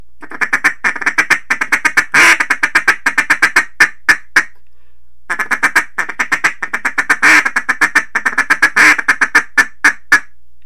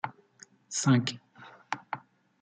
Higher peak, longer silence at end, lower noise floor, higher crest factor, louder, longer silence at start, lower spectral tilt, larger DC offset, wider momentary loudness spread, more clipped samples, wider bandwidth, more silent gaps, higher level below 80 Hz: first, 0 dBFS vs -12 dBFS; about the same, 0.45 s vs 0.45 s; about the same, -55 dBFS vs -58 dBFS; second, 14 dB vs 20 dB; first, -11 LUFS vs -31 LUFS; first, 0.2 s vs 0.05 s; second, -0.5 dB/octave vs -4.5 dB/octave; first, 5% vs under 0.1%; second, 9 LU vs 23 LU; first, 0.5% vs under 0.1%; first, 17.5 kHz vs 9.4 kHz; neither; first, -48 dBFS vs -74 dBFS